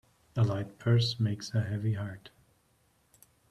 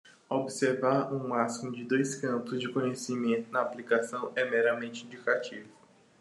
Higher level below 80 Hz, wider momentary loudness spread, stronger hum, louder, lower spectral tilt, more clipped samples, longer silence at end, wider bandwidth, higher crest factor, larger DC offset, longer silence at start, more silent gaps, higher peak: first, -64 dBFS vs -82 dBFS; first, 12 LU vs 7 LU; neither; about the same, -31 LUFS vs -31 LUFS; first, -6.5 dB/octave vs -5 dB/octave; neither; first, 1.2 s vs 0.5 s; about the same, 11.5 kHz vs 12.5 kHz; about the same, 18 dB vs 20 dB; neither; first, 0.35 s vs 0.05 s; neither; about the same, -14 dBFS vs -12 dBFS